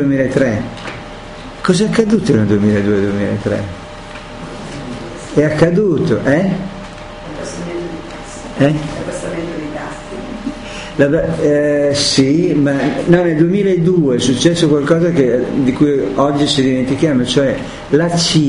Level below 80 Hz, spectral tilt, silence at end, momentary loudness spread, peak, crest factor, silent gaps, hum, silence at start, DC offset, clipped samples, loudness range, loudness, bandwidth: -38 dBFS; -5.5 dB/octave; 0 s; 15 LU; 0 dBFS; 14 dB; none; none; 0 s; under 0.1%; under 0.1%; 8 LU; -14 LUFS; 11 kHz